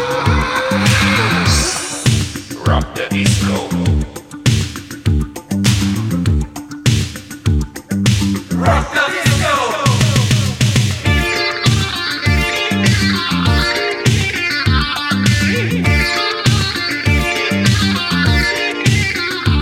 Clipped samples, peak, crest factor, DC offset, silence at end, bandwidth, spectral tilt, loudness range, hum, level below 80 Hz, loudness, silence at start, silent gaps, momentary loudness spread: under 0.1%; 0 dBFS; 14 dB; under 0.1%; 0 s; 16.5 kHz; -4.5 dB/octave; 3 LU; none; -28 dBFS; -15 LUFS; 0 s; none; 5 LU